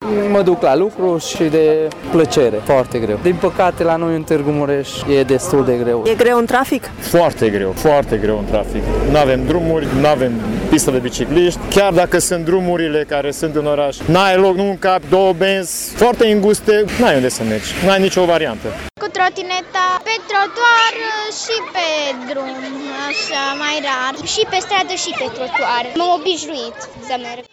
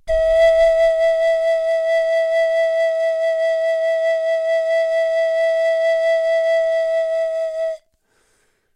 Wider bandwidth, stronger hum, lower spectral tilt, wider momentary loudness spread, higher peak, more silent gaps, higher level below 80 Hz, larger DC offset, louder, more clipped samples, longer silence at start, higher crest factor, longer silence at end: first, 17.5 kHz vs 10 kHz; neither; first, -4.5 dB/octave vs -1 dB/octave; first, 8 LU vs 5 LU; about the same, -2 dBFS vs -4 dBFS; neither; first, -34 dBFS vs -44 dBFS; neither; about the same, -15 LUFS vs -17 LUFS; neither; about the same, 0 s vs 0.05 s; about the same, 14 dB vs 12 dB; second, 0.1 s vs 1 s